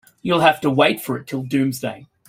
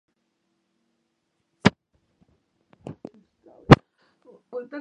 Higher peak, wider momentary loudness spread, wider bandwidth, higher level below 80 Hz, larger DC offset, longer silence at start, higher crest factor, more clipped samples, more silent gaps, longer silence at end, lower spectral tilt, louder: about the same, -2 dBFS vs 0 dBFS; second, 11 LU vs 27 LU; first, 16.5 kHz vs 9.6 kHz; second, -58 dBFS vs -44 dBFS; neither; second, 0.25 s vs 1.65 s; second, 18 dB vs 26 dB; neither; neither; first, 0.25 s vs 0 s; second, -5.5 dB/octave vs -7 dB/octave; about the same, -19 LUFS vs -19 LUFS